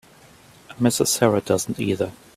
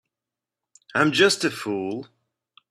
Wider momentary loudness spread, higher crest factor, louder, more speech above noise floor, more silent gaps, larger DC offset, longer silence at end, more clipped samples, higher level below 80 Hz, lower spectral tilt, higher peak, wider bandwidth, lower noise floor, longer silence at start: second, 6 LU vs 13 LU; about the same, 22 dB vs 22 dB; about the same, -21 LUFS vs -22 LUFS; second, 29 dB vs 66 dB; neither; neither; second, 0.25 s vs 0.65 s; neither; first, -56 dBFS vs -68 dBFS; about the same, -4.5 dB/octave vs -3.5 dB/octave; about the same, -2 dBFS vs -4 dBFS; first, 16 kHz vs 14.5 kHz; second, -50 dBFS vs -88 dBFS; second, 0.7 s vs 0.95 s